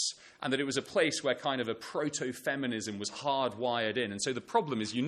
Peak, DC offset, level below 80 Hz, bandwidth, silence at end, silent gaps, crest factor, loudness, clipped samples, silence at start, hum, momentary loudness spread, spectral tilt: -14 dBFS; under 0.1%; -74 dBFS; 13 kHz; 0 s; none; 20 dB; -33 LUFS; under 0.1%; 0 s; none; 6 LU; -3.5 dB/octave